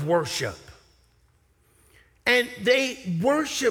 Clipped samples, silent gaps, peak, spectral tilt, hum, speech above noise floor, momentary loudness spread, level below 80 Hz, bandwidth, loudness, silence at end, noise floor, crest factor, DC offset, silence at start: under 0.1%; none; -6 dBFS; -4 dB/octave; none; 39 dB; 8 LU; -60 dBFS; 18.5 kHz; -24 LUFS; 0 s; -63 dBFS; 20 dB; under 0.1%; 0 s